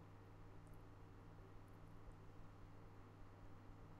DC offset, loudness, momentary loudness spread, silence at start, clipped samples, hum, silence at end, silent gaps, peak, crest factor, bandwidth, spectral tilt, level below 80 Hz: under 0.1%; -63 LUFS; 1 LU; 0 s; under 0.1%; none; 0 s; none; -46 dBFS; 12 dB; 12.5 kHz; -7 dB/octave; -66 dBFS